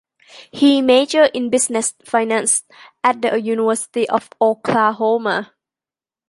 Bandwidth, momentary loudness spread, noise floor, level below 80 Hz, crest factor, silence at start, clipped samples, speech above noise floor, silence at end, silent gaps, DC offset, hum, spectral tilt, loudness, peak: 11.5 kHz; 6 LU; under -90 dBFS; -64 dBFS; 16 dB; 0.35 s; under 0.1%; over 73 dB; 0.85 s; none; under 0.1%; none; -2.5 dB/octave; -17 LUFS; -2 dBFS